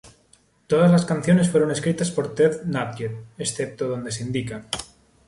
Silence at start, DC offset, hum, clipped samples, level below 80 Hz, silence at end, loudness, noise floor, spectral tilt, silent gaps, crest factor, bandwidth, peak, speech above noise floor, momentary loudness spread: 0.05 s; under 0.1%; none; under 0.1%; -56 dBFS; 0.4 s; -22 LUFS; -59 dBFS; -6 dB/octave; none; 16 dB; 11.5 kHz; -6 dBFS; 37 dB; 13 LU